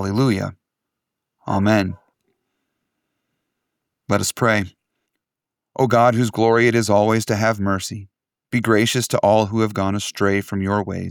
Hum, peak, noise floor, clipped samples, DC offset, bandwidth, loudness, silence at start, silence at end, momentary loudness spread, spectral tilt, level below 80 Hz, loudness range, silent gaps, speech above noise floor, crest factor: none; -4 dBFS; -86 dBFS; under 0.1%; under 0.1%; 18 kHz; -19 LUFS; 0 s; 0 s; 11 LU; -5.5 dB/octave; -56 dBFS; 7 LU; none; 68 dB; 18 dB